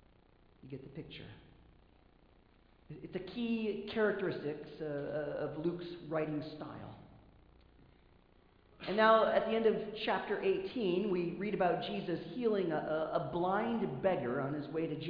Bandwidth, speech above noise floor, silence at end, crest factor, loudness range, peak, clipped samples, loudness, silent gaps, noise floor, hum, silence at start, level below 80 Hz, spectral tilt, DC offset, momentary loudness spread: 5.2 kHz; 30 dB; 0 s; 22 dB; 11 LU; -14 dBFS; under 0.1%; -35 LUFS; none; -65 dBFS; none; 0.65 s; -66 dBFS; -4.5 dB/octave; under 0.1%; 17 LU